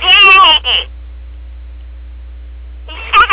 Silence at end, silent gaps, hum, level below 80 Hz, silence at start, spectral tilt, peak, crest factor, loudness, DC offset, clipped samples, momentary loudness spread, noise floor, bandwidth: 0 s; none; none; -30 dBFS; 0 s; -5.5 dB/octave; 0 dBFS; 12 dB; -6 LUFS; under 0.1%; 0.3%; 24 LU; -29 dBFS; 4 kHz